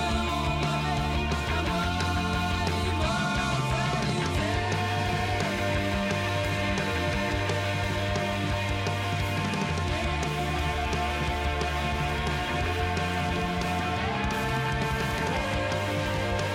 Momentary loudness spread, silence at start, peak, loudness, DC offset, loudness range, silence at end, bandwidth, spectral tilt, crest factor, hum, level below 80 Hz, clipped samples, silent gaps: 1 LU; 0 s; -14 dBFS; -28 LUFS; under 0.1%; 1 LU; 0 s; 16.5 kHz; -5 dB/octave; 14 dB; none; -36 dBFS; under 0.1%; none